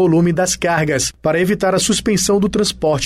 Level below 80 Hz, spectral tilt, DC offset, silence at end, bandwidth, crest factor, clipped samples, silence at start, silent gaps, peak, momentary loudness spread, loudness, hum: -40 dBFS; -4 dB/octave; under 0.1%; 0 s; 15.5 kHz; 10 dB; under 0.1%; 0 s; none; -4 dBFS; 3 LU; -16 LUFS; none